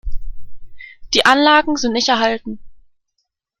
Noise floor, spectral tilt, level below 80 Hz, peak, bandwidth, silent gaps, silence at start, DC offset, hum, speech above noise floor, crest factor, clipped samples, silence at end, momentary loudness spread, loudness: -73 dBFS; -2.5 dB/octave; -32 dBFS; 0 dBFS; 12.5 kHz; none; 0.05 s; under 0.1%; none; 58 dB; 18 dB; under 0.1%; 0.85 s; 22 LU; -14 LUFS